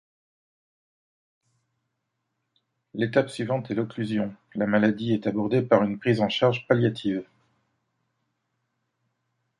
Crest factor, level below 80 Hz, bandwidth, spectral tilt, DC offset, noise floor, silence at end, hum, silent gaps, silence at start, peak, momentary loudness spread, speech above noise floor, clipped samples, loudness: 22 dB; -66 dBFS; 11 kHz; -7.5 dB/octave; under 0.1%; -80 dBFS; 2.35 s; none; none; 2.95 s; -4 dBFS; 8 LU; 55 dB; under 0.1%; -25 LUFS